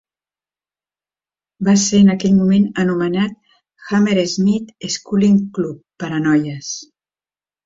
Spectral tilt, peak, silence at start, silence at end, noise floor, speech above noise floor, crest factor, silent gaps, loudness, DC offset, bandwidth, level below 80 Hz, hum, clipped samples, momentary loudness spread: -5.5 dB/octave; -2 dBFS; 1.6 s; 0.85 s; under -90 dBFS; over 75 dB; 14 dB; none; -16 LUFS; under 0.1%; 7.8 kHz; -54 dBFS; none; under 0.1%; 12 LU